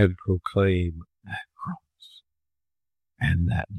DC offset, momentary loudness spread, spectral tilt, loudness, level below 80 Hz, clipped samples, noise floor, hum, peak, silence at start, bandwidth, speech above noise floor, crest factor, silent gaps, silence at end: under 0.1%; 14 LU; -8.5 dB/octave; -27 LUFS; -46 dBFS; under 0.1%; under -90 dBFS; none; -6 dBFS; 0 s; 9.6 kHz; over 67 dB; 20 dB; none; 0 s